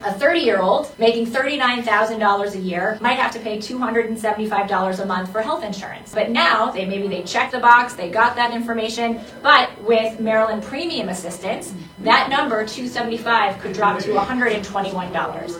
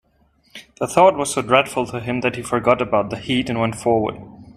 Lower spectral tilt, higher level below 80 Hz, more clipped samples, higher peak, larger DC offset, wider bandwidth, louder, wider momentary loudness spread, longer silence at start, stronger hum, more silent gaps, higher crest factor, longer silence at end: about the same, -4 dB/octave vs -4.5 dB/octave; about the same, -54 dBFS vs -50 dBFS; neither; about the same, 0 dBFS vs 0 dBFS; neither; first, 17 kHz vs 15 kHz; about the same, -19 LUFS vs -19 LUFS; about the same, 10 LU vs 9 LU; second, 0 s vs 0.55 s; neither; neither; about the same, 20 dB vs 20 dB; about the same, 0 s vs 0.1 s